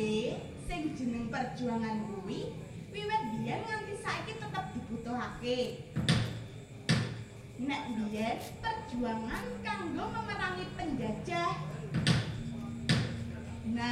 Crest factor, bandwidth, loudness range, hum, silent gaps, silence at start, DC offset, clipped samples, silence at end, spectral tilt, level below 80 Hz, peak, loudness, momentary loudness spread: 22 dB; 15 kHz; 3 LU; none; none; 0 s; under 0.1%; under 0.1%; 0 s; -5.5 dB/octave; -54 dBFS; -12 dBFS; -36 LUFS; 9 LU